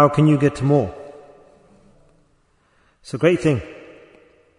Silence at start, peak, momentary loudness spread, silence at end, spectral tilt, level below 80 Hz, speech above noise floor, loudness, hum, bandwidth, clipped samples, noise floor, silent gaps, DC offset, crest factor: 0 s; -2 dBFS; 23 LU; 0.85 s; -8 dB/octave; -52 dBFS; 44 dB; -18 LUFS; none; 10.5 kHz; under 0.1%; -61 dBFS; none; under 0.1%; 20 dB